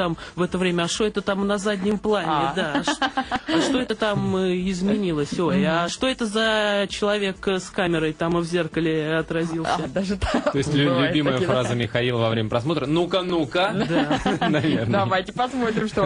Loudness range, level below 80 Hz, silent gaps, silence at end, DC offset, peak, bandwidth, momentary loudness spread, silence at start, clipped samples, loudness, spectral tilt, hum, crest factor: 1 LU; -46 dBFS; none; 0 s; under 0.1%; -6 dBFS; 10.5 kHz; 4 LU; 0 s; under 0.1%; -22 LUFS; -5.5 dB/octave; none; 16 dB